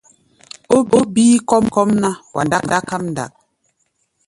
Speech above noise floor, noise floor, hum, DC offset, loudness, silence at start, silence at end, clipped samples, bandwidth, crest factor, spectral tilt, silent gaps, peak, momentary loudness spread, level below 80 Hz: 51 dB; -66 dBFS; none; under 0.1%; -16 LUFS; 0.7 s; 1 s; under 0.1%; 11.5 kHz; 16 dB; -5 dB/octave; none; 0 dBFS; 11 LU; -52 dBFS